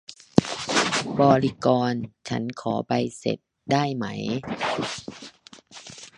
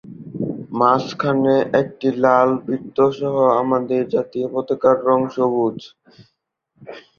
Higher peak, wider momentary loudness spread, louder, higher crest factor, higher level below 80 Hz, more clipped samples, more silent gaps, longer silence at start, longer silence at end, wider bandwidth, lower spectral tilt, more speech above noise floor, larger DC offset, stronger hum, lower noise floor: about the same, 0 dBFS vs -2 dBFS; first, 20 LU vs 11 LU; second, -25 LUFS vs -18 LUFS; first, 26 dB vs 18 dB; first, -56 dBFS vs -62 dBFS; neither; neither; about the same, 0.1 s vs 0.05 s; about the same, 0.1 s vs 0.2 s; first, 11 kHz vs 6.8 kHz; second, -5 dB/octave vs -7.5 dB/octave; second, 23 dB vs 51 dB; neither; neither; second, -47 dBFS vs -69 dBFS